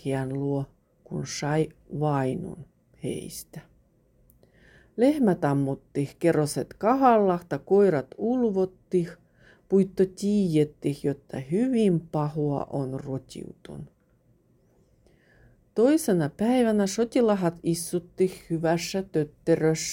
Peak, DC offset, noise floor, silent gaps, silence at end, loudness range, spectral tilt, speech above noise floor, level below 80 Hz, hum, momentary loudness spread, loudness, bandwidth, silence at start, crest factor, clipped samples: -8 dBFS; under 0.1%; -64 dBFS; none; 0 s; 8 LU; -6.5 dB/octave; 39 dB; -58 dBFS; none; 14 LU; -26 LUFS; 17 kHz; 0.05 s; 18 dB; under 0.1%